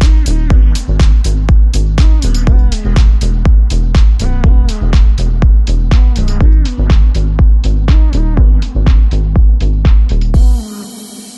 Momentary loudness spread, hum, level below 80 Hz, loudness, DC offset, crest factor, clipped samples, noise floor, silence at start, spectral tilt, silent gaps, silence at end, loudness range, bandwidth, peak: 2 LU; none; -8 dBFS; -11 LUFS; under 0.1%; 8 dB; under 0.1%; -29 dBFS; 0 s; -6.5 dB/octave; none; 0 s; 0 LU; 8.8 kHz; 0 dBFS